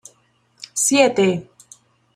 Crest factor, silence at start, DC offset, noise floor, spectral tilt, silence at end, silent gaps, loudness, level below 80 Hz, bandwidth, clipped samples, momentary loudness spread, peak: 20 dB; 0.6 s; under 0.1%; -60 dBFS; -3 dB/octave; 0.7 s; none; -17 LUFS; -64 dBFS; 15 kHz; under 0.1%; 14 LU; -2 dBFS